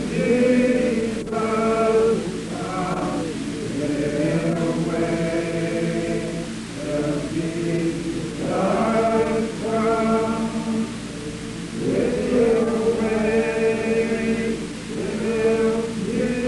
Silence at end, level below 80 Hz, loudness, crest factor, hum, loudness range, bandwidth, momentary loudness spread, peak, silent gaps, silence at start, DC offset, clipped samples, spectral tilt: 0 s; -44 dBFS; -22 LUFS; 14 dB; none; 3 LU; 11.5 kHz; 9 LU; -8 dBFS; none; 0 s; under 0.1%; under 0.1%; -6 dB/octave